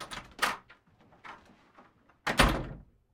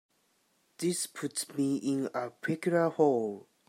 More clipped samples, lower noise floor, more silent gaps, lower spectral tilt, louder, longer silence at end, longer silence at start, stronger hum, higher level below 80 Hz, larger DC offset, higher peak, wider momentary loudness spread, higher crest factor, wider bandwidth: neither; second, -62 dBFS vs -72 dBFS; neither; second, -3.5 dB/octave vs -5 dB/octave; about the same, -30 LUFS vs -31 LUFS; about the same, 0.3 s vs 0.3 s; second, 0 s vs 0.8 s; neither; first, -42 dBFS vs -82 dBFS; neither; first, -6 dBFS vs -12 dBFS; first, 24 LU vs 9 LU; first, 28 dB vs 20 dB; about the same, 17.5 kHz vs 16 kHz